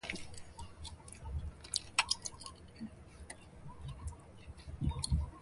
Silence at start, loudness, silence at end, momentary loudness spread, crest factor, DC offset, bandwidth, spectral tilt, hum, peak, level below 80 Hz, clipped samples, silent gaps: 0.05 s; -40 LUFS; 0 s; 19 LU; 28 dB; under 0.1%; 11.5 kHz; -3 dB/octave; none; -12 dBFS; -46 dBFS; under 0.1%; none